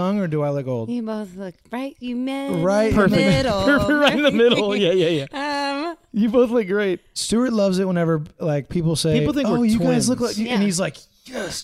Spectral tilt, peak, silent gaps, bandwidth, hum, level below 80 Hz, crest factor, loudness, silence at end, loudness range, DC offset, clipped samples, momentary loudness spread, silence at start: -5.5 dB/octave; -4 dBFS; none; 15 kHz; none; -44 dBFS; 16 dB; -20 LUFS; 0 s; 3 LU; under 0.1%; under 0.1%; 12 LU; 0 s